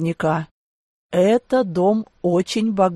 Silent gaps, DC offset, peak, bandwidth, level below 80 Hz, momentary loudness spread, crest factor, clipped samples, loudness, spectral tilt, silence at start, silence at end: 0.51-1.10 s; under 0.1%; -6 dBFS; 12.5 kHz; -58 dBFS; 7 LU; 14 dB; under 0.1%; -20 LUFS; -6.5 dB/octave; 0 s; 0 s